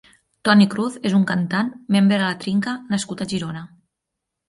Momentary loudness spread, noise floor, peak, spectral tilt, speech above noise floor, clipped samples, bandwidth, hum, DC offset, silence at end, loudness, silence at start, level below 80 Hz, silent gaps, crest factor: 10 LU; -81 dBFS; -2 dBFS; -5.5 dB/octave; 62 dB; under 0.1%; 11.5 kHz; none; under 0.1%; 0.8 s; -20 LUFS; 0.45 s; -60 dBFS; none; 18 dB